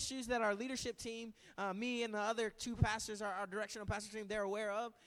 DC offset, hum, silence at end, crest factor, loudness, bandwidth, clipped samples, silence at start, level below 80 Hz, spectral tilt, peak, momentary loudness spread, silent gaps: under 0.1%; none; 0.15 s; 22 dB; -40 LUFS; 16 kHz; under 0.1%; 0 s; -56 dBFS; -4 dB/octave; -20 dBFS; 7 LU; none